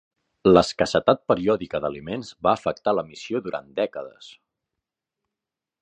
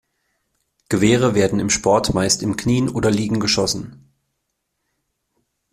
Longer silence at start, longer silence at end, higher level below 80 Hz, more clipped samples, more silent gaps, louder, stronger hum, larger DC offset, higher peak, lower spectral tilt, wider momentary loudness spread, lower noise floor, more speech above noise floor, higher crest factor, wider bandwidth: second, 0.45 s vs 0.9 s; second, 1.55 s vs 1.8 s; second, -52 dBFS vs -44 dBFS; neither; neither; second, -23 LUFS vs -18 LUFS; neither; neither; about the same, -2 dBFS vs -2 dBFS; about the same, -5.5 dB/octave vs -4.5 dB/octave; first, 13 LU vs 6 LU; first, -88 dBFS vs -75 dBFS; first, 65 dB vs 57 dB; about the same, 22 dB vs 18 dB; second, 10 kHz vs 15 kHz